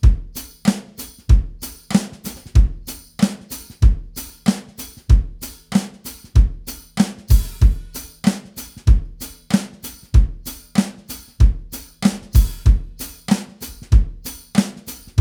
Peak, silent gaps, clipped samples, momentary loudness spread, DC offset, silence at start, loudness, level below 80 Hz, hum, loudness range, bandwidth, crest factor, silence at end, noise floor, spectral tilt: 0 dBFS; none; under 0.1%; 16 LU; under 0.1%; 0.05 s; -20 LUFS; -20 dBFS; none; 2 LU; over 20 kHz; 18 dB; 0 s; -37 dBFS; -6 dB/octave